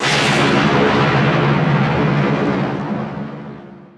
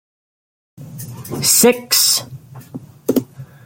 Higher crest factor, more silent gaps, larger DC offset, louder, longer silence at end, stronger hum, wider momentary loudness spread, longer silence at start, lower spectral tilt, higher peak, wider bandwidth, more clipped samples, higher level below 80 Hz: second, 12 dB vs 20 dB; neither; neither; about the same, -15 LUFS vs -14 LUFS; about the same, 0.1 s vs 0.2 s; neither; second, 15 LU vs 25 LU; second, 0 s vs 0.8 s; first, -5.5 dB/octave vs -2 dB/octave; second, -4 dBFS vs 0 dBFS; second, 11 kHz vs 17 kHz; neither; first, -44 dBFS vs -58 dBFS